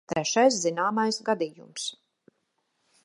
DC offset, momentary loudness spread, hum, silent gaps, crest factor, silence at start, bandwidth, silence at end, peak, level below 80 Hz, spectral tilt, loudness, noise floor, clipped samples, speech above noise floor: under 0.1%; 12 LU; none; none; 20 dB; 0.1 s; 11.5 kHz; 1.1 s; -8 dBFS; -70 dBFS; -3 dB/octave; -26 LUFS; -76 dBFS; under 0.1%; 50 dB